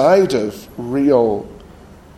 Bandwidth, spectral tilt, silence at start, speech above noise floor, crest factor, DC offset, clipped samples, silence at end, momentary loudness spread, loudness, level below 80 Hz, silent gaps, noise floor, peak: 14.5 kHz; -6.5 dB/octave; 0 s; 26 dB; 16 dB; under 0.1%; under 0.1%; 0.55 s; 15 LU; -17 LUFS; -46 dBFS; none; -41 dBFS; 0 dBFS